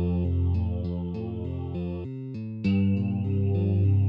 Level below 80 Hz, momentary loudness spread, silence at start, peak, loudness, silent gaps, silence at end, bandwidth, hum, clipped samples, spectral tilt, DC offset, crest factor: -42 dBFS; 10 LU; 0 s; -14 dBFS; -28 LUFS; none; 0 s; 5 kHz; none; under 0.1%; -11 dB/octave; under 0.1%; 12 dB